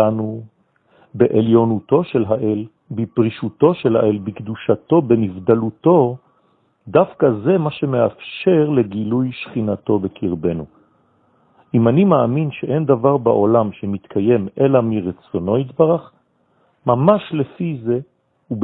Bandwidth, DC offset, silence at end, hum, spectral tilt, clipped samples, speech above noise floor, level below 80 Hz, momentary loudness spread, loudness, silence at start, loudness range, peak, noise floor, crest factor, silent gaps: 4.4 kHz; under 0.1%; 0 s; none; -12.5 dB/octave; under 0.1%; 44 dB; -56 dBFS; 10 LU; -17 LUFS; 0 s; 3 LU; 0 dBFS; -60 dBFS; 18 dB; none